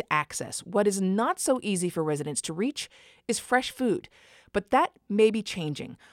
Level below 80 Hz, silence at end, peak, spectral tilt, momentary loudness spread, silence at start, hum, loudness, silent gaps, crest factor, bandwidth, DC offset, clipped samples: -62 dBFS; 0.15 s; -8 dBFS; -4 dB/octave; 9 LU; 0 s; none; -27 LUFS; none; 20 dB; 16.5 kHz; under 0.1%; under 0.1%